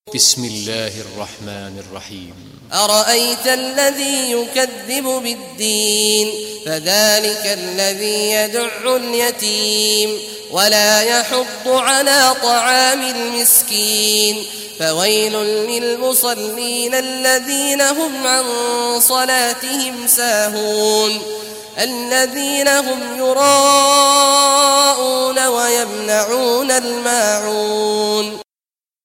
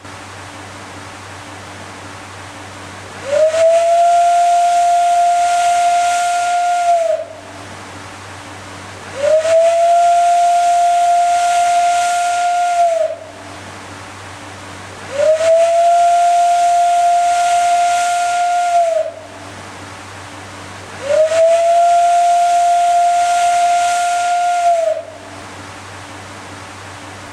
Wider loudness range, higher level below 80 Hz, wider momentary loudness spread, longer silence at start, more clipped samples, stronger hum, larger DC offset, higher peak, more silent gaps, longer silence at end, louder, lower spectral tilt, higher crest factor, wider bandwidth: about the same, 5 LU vs 6 LU; about the same, -62 dBFS vs -58 dBFS; second, 11 LU vs 20 LU; about the same, 0.05 s vs 0.05 s; neither; neither; neither; first, 0 dBFS vs -4 dBFS; neither; first, 0.6 s vs 0 s; about the same, -14 LUFS vs -13 LUFS; second, -0.5 dB/octave vs -2 dB/octave; about the same, 16 dB vs 12 dB; first, 16.5 kHz vs 12.5 kHz